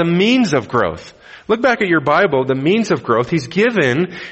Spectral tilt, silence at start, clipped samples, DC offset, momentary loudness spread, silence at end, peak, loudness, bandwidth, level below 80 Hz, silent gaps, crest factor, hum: -6 dB/octave; 0 s; under 0.1%; under 0.1%; 7 LU; 0 s; -2 dBFS; -15 LUFS; 8.4 kHz; -50 dBFS; none; 14 dB; none